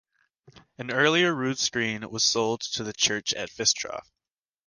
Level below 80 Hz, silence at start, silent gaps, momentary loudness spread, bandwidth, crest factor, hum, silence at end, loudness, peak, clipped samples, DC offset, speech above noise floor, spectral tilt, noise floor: -64 dBFS; 0.55 s; none; 9 LU; 11 kHz; 22 dB; none; 0.65 s; -25 LUFS; -6 dBFS; under 0.1%; under 0.1%; over 64 dB; -2 dB/octave; under -90 dBFS